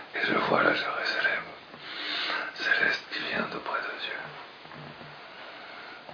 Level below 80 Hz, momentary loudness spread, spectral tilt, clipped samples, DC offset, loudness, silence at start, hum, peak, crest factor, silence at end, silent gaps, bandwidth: -70 dBFS; 19 LU; -4 dB/octave; under 0.1%; under 0.1%; -28 LUFS; 0 s; none; -8 dBFS; 24 dB; 0 s; none; 5.4 kHz